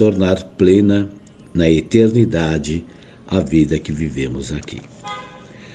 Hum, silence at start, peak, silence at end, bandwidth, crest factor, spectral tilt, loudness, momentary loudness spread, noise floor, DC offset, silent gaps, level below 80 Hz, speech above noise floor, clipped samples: none; 0 s; 0 dBFS; 0 s; 9.6 kHz; 16 dB; -7 dB/octave; -15 LUFS; 17 LU; -36 dBFS; under 0.1%; none; -36 dBFS; 22 dB; under 0.1%